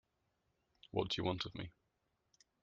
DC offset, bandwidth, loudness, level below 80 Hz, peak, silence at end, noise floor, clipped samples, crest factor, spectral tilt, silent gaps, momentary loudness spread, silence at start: under 0.1%; 7.4 kHz; -41 LUFS; -68 dBFS; -20 dBFS; 0.95 s; -83 dBFS; under 0.1%; 24 dB; -4 dB/octave; none; 12 LU; 0.95 s